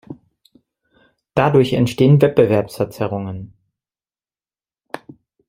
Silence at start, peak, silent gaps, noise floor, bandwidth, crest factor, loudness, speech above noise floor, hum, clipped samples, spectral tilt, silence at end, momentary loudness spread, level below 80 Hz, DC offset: 0.1 s; -2 dBFS; none; under -90 dBFS; 15.5 kHz; 18 dB; -16 LUFS; over 75 dB; none; under 0.1%; -7.5 dB/octave; 0.5 s; 22 LU; -52 dBFS; under 0.1%